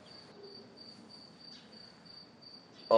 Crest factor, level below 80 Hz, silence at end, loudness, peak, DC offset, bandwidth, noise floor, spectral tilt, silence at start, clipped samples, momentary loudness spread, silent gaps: 26 dB; -84 dBFS; 0 s; -52 LUFS; -12 dBFS; under 0.1%; 12.5 kHz; -55 dBFS; -5 dB/octave; 0.45 s; under 0.1%; 2 LU; none